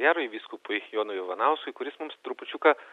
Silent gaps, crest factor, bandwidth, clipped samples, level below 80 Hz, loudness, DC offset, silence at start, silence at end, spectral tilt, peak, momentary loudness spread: none; 22 dB; 4.6 kHz; under 0.1%; -86 dBFS; -29 LUFS; under 0.1%; 0 s; 0 s; -3.5 dB/octave; -6 dBFS; 13 LU